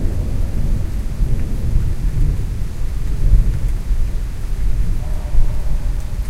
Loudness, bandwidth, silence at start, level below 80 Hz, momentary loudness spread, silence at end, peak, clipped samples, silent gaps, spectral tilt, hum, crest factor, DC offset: -22 LUFS; 12 kHz; 0 s; -16 dBFS; 7 LU; 0 s; 0 dBFS; under 0.1%; none; -7 dB/octave; none; 14 dB; under 0.1%